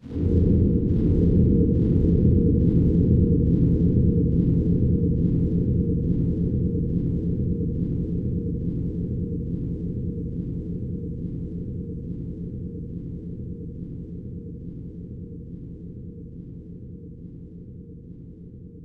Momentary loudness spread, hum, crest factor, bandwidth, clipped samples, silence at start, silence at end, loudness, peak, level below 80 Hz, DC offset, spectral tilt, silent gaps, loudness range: 20 LU; none; 16 dB; 1.9 kHz; under 0.1%; 0.05 s; 0 s; -23 LUFS; -6 dBFS; -32 dBFS; under 0.1%; -13 dB/octave; none; 18 LU